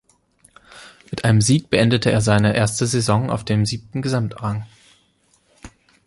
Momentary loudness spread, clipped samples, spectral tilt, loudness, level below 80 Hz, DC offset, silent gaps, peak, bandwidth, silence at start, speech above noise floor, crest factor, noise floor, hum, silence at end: 10 LU; under 0.1%; -5.5 dB/octave; -19 LUFS; -46 dBFS; under 0.1%; none; -2 dBFS; 11.5 kHz; 0.75 s; 43 dB; 18 dB; -61 dBFS; none; 0.4 s